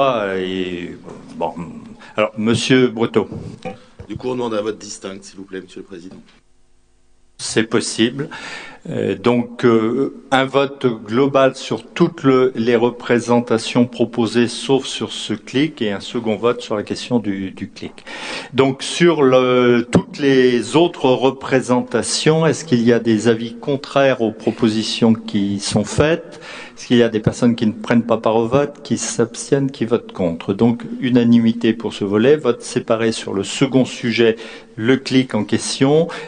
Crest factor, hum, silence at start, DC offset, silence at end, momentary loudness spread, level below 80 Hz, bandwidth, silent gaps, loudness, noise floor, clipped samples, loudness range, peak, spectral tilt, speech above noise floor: 18 dB; none; 0 s; under 0.1%; 0 s; 15 LU; -50 dBFS; 10 kHz; none; -17 LUFS; -52 dBFS; under 0.1%; 7 LU; 0 dBFS; -5 dB/octave; 35 dB